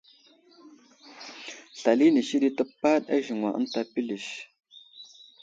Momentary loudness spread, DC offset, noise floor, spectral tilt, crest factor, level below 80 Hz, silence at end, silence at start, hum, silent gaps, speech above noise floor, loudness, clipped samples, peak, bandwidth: 25 LU; under 0.1%; -58 dBFS; -4.5 dB/octave; 20 dB; -76 dBFS; 0.4 s; 0.65 s; none; none; 33 dB; -26 LUFS; under 0.1%; -8 dBFS; 7.8 kHz